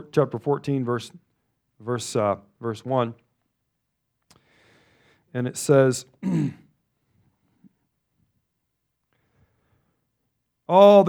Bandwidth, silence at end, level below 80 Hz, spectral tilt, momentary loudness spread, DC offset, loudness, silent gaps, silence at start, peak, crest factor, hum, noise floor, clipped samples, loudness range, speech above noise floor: 16 kHz; 0 s; -72 dBFS; -6 dB/octave; 14 LU; under 0.1%; -23 LUFS; none; 0.15 s; -2 dBFS; 22 dB; none; -78 dBFS; under 0.1%; 7 LU; 57 dB